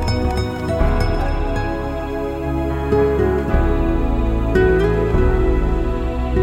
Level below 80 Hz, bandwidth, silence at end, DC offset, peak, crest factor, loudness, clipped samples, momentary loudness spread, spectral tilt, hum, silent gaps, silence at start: -20 dBFS; 12.5 kHz; 0 s; under 0.1%; -4 dBFS; 14 dB; -19 LUFS; under 0.1%; 6 LU; -8 dB/octave; none; none; 0 s